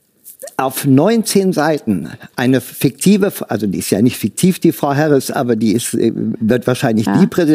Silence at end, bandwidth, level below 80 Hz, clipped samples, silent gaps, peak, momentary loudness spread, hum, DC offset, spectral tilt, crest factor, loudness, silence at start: 0 s; 16 kHz; -54 dBFS; under 0.1%; none; 0 dBFS; 7 LU; none; under 0.1%; -5.5 dB/octave; 14 dB; -15 LUFS; 0.25 s